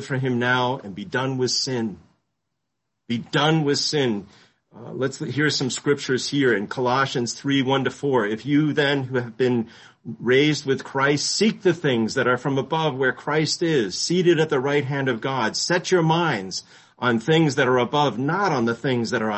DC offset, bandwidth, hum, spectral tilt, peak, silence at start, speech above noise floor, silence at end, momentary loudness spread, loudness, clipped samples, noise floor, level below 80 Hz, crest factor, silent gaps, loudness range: under 0.1%; 8.6 kHz; none; -4.5 dB/octave; -6 dBFS; 0 s; 58 dB; 0 s; 8 LU; -22 LUFS; under 0.1%; -80 dBFS; -62 dBFS; 16 dB; none; 4 LU